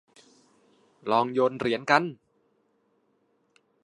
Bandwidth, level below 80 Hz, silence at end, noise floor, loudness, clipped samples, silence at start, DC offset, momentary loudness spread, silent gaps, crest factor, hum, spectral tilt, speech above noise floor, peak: 11 kHz; -72 dBFS; 1.7 s; -70 dBFS; -25 LUFS; under 0.1%; 1.05 s; under 0.1%; 11 LU; none; 26 dB; none; -5.5 dB/octave; 45 dB; -4 dBFS